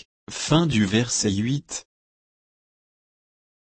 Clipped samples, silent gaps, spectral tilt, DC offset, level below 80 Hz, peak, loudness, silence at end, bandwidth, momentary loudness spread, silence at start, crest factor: under 0.1%; none; -4.5 dB/octave; under 0.1%; -54 dBFS; -6 dBFS; -22 LUFS; 1.95 s; 8.8 kHz; 14 LU; 0.3 s; 20 dB